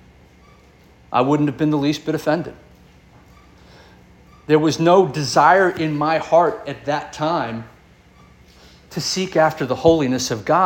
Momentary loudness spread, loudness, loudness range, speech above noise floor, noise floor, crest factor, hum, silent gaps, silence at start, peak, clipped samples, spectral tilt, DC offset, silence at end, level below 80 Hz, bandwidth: 10 LU; -18 LUFS; 6 LU; 32 dB; -49 dBFS; 18 dB; none; none; 1.1 s; -2 dBFS; under 0.1%; -5 dB/octave; under 0.1%; 0 s; -52 dBFS; 17 kHz